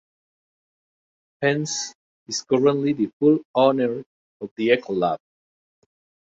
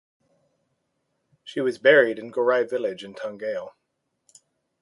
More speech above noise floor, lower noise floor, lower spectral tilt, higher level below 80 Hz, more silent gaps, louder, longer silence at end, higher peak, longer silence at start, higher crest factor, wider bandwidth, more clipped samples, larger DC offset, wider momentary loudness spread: first, over 69 dB vs 55 dB; first, under -90 dBFS vs -77 dBFS; about the same, -5 dB/octave vs -5 dB/octave; first, -68 dBFS vs -78 dBFS; first, 1.95-2.26 s, 3.13-3.20 s, 3.45-3.54 s, 4.06-4.40 s, 4.51-4.56 s vs none; about the same, -22 LUFS vs -23 LUFS; about the same, 1.15 s vs 1.15 s; about the same, -4 dBFS vs -4 dBFS; about the same, 1.4 s vs 1.45 s; about the same, 20 dB vs 22 dB; second, 8 kHz vs 11.5 kHz; neither; neither; second, 14 LU vs 17 LU